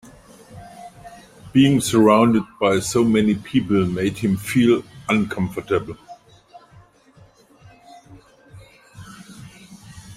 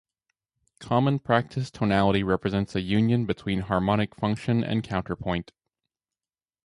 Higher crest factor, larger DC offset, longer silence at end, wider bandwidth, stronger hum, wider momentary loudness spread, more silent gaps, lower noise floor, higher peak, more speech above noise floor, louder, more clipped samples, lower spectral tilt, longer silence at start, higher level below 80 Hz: about the same, 18 dB vs 20 dB; neither; second, 0 s vs 1.25 s; first, 16 kHz vs 11 kHz; neither; first, 25 LU vs 7 LU; neither; second, -51 dBFS vs under -90 dBFS; first, -2 dBFS vs -6 dBFS; second, 34 dB vs over 65 dB; first, -19 LUFS vs -26 LUFS; neither; second, -5.5 dB/octave vs -7.5 dB/octave; second, 0.5 s vs 0.8 s; about the same, -52 dBFS vs -48 dBFS